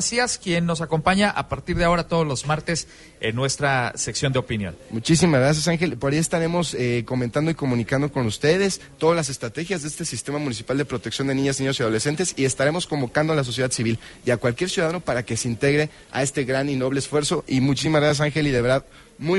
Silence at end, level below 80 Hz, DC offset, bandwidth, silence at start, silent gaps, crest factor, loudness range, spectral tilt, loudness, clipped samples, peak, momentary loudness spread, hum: 0 s; -46 dBFS; under 0.1%; 11.5 kHz; 0 s; none; 18 dB; 2 LU; -4.5 dB/octave; -22 LUFS; under 0.1%; -4 dBFS; 8 LU; none